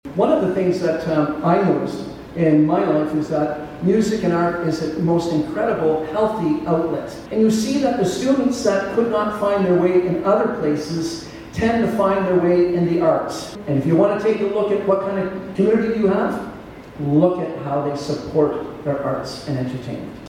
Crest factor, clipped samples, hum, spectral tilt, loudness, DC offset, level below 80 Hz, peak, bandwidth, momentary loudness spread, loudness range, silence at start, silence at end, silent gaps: 16 dB; under 0.1%; none; -7 dB/octave; -19 LUFS; under 0.1%; -48 dBFS; -2 dBFS; 15 kHz; 9 LU; 2 LU; 0.05 s; 0 s; none